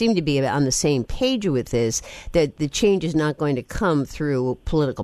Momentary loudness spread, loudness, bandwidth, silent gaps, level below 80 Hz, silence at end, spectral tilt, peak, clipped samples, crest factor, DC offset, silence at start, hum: 5 LU; -22 LUFS; 13.5 kHz; none; -38 dBFS; 0 s; -5 dB/octave; -6 dBFS; under 0.1%; 16 dB; under 0.1%; 0 s; none